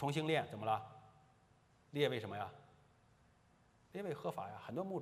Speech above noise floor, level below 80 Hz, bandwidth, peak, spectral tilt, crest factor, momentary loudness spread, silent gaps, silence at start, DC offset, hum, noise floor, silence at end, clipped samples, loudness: 30 dB; -80 dBFS; 14 kHz; -22 dBFS; -6 dB/octave; 22 dB; 13 LU; none; 0 s; under 0.1%; none; -71 dBFS; 0 s; under 0.1%; -41 LUFS